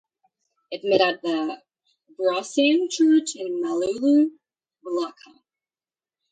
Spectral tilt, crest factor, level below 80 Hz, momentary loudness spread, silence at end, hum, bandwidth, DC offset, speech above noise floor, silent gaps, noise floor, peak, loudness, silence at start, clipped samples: -3.5 dB/octave; 20 dB; -72 dBFS; 12 LU; 1.2 s; none; 9.4 kHz; under 0.1%; over 68 dB; none; under -90 dBFS; -4 dBFS; -22 LUFS; 0.7 s; under 0.1%